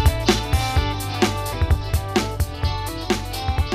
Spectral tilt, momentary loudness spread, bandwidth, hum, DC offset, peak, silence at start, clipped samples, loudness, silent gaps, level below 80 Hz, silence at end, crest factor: -5 dB/octave; 5 LU; 15.5 kHz; none; under 0.1%; -4 dBFS; 0 s; under 0.1%; -22 LUFS; none; -26 dBFS; 0 s; 18 dB